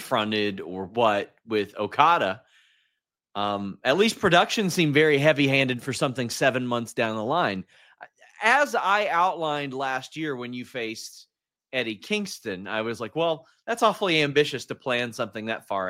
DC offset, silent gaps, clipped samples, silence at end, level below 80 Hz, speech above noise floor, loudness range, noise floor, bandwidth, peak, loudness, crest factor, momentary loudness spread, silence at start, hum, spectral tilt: under 0.1%; none; under 0.1%; 0 s; -66 dBFS; 53 dB; 8 LU; -78 dBFS; 16 kHz; -2 dBFS; -24 LUFS; 24 dB; 12 LU; 0 s; none; -4.5 dB/octave